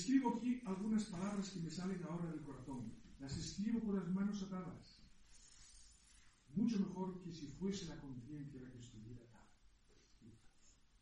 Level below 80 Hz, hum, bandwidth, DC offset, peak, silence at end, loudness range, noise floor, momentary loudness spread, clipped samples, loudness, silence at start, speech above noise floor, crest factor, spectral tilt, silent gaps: -66 dBFS; none; 10.5 kHz; under 0.1%; -24 dBFS; 0.3 s; 7 LU; -69 dBFS; 21 LU; under 0.1%; -44 LUFS; 0 s; 25 dB; 20 dB; -6 dB/octave; none